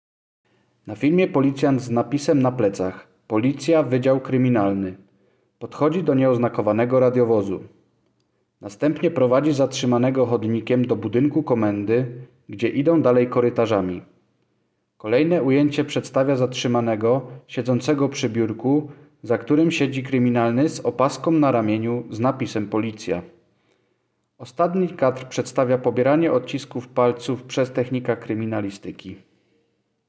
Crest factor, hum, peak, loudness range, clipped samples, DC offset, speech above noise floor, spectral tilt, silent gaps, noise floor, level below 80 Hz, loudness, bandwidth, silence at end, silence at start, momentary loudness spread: 16 dB; none; -4 dBFS; 3 LU; under 0.1%; under 0.1%; 50 dB; -7 dB/octave; none; -70 dBFS; -58 dBFS; -21 LUFS; 8 kHz; 0.9 s; 0.85 s; 11 LU